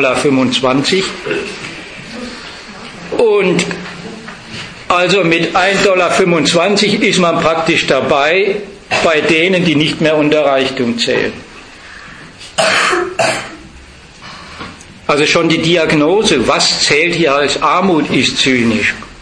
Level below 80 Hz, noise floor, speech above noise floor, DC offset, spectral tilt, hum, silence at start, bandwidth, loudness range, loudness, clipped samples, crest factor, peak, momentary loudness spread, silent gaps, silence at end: -44 dBFS; -36 dBFS; 25 dB; under 0.1%; -4 dB/octave; none; 0 s; 10.5 kHz; 6 LU; -12 LUFS; under 0.1%; 14 dB; 0 dBFS; 18 LU; none; 0 s